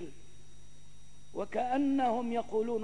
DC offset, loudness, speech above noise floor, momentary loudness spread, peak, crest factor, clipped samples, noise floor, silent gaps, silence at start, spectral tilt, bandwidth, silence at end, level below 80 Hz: 0.8%; -32 LUFS; 28 dB; 14 LU; -20 dBFS; 14 dB; under 0.1%; -59 dBFS; none; 0 s; -6 dB/octave; 10.5 kHz; 0 s; -62 dBFS